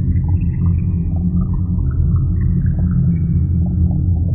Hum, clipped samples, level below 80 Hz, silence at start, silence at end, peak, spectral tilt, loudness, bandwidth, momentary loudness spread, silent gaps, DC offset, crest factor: none; under 0.1%; -22 dBFS; 0 s; 0 s; -4 dBFS; -15 dB/octave; -17 LUFS; 2.6 kHz; 3 LU; none; under 0.1%; 12 dB